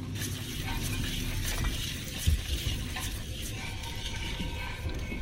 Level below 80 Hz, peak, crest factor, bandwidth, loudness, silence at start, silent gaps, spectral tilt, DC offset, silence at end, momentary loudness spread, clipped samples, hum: -36 dBFS; -14 dBFS; 18 dB; 16 kHz; -34 LUFS; 0 s; none; -3.5 dB/octave; under 0.1%; 0 s; 6 LU; under 0.1%; none